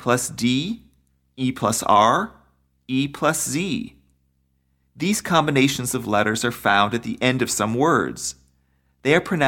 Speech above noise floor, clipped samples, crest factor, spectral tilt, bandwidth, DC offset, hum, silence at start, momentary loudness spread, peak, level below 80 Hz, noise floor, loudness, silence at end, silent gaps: 46 dB; under 0.1%; 18 dB; -4 dB/octave; 17.5 kHz; under 0.1%; none; 0 s; 10 LU; -4 dBFS; -54 dBFS; -67 dBFS; -21 LUFS; 0 s; none